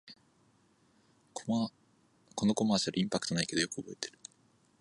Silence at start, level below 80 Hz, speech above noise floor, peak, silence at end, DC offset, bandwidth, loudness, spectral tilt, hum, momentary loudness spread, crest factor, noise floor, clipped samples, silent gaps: 0.05 s; -70 dBFS; 36 dB; -14 dBFS; 0.7 s; under 0.1%; 11.5 kHz; -33 LUFS; -4 dB/octave; none; 15 LU; 22 dB; -69 dBFS; under 0.1%; none